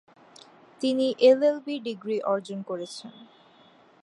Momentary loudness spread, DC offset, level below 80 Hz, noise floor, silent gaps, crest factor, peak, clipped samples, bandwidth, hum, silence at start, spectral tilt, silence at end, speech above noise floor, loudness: 17 LU; under 0.1%; -84 dBFS; -57 dBFS; none; 20 dB; -8 dBFS; under 0.1%; 11 kHz; none; 0.8 s; -5 dB/octave; 0.8 s; 32 dB; -25 LUFS